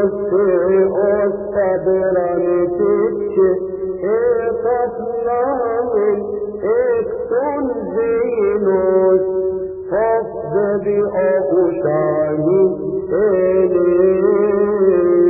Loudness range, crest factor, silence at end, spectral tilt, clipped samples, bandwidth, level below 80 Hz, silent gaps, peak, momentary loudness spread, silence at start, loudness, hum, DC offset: 3 LU; 12 dB; 0 s; -15 dB/octave; under 0.1%; 2.8 kHz; -48 dBFS; none; -4 dBFS; 6 LU; 0 s; -16 LUFS; none; under 0.1%